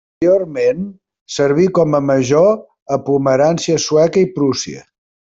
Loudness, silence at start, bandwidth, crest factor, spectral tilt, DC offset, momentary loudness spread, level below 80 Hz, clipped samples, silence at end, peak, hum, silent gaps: -15 LUFS; 0.2 s; 7.8 kHz; 12 dB; -5.5 dB/octave; under 0.1%; 11 LU; -54 dBFS; under 0.1%; 0.55 s; -2 dBFS; none; 1.21-1.26 s, 2.82-2.86 s